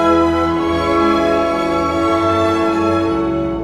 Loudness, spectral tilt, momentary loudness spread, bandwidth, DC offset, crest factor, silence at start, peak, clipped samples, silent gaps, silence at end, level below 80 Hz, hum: -15 LUFS; -6.5 dB/octave; 3 LU; 11 kHz; under 0.1%; 12 dB; 0 s; -2 dBFS; under 0.1%; none; 0 s; -36 dBFS; none